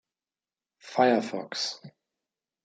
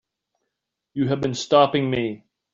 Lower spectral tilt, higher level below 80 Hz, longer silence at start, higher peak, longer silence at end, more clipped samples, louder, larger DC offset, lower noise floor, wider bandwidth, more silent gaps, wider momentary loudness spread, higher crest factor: second, -4 dB/octave vs -5.5 dB/octave; second, -82 dBFS vs -58 dBFS; about the same, 0.85 s vs 0.95 s; second, -8 dBFS vs -4 dBFS; first, 0.75 s vs 0.35 s; neither; second, -27 LUFS vs -21 LUFS; neither; first, under -90 dBFS vs -82 dBFS; first, 9.4 kHz vs 7.8 kHz; neither; second, 11 LU vs 15 LU; about the same, 22 dB vs 20 dB